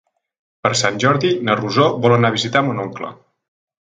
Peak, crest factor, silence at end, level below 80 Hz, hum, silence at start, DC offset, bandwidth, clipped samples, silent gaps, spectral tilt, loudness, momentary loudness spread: 0 dBFS; 18 dB; 0.8 s; -58 dBFS; none; 0.65 s; under 0.1%; 9.4 kHz; under 0.1%; none; -5 dB/octave; -17 LUFS; 11 LU